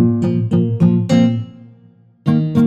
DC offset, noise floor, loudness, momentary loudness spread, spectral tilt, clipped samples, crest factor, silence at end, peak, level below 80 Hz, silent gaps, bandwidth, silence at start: under 0.1%; -48 dBFS; -16 LUFS; 10 LU; -8.5 dB/octave; under 0.1%; 14 dB; 0 s; -2 dBFS; -54 dBFS; none; 8 kHz; 0 s